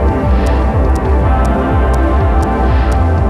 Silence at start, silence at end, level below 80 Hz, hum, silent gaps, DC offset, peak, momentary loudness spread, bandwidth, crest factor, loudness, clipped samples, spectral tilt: 0 s; 0 s; -12 dBFS; none; none; under 0.1%; -2 dBFS; 1 LU; 9.8 kHz; 10 dB; -13 LUFS; under 0.1%; -8 dB/octave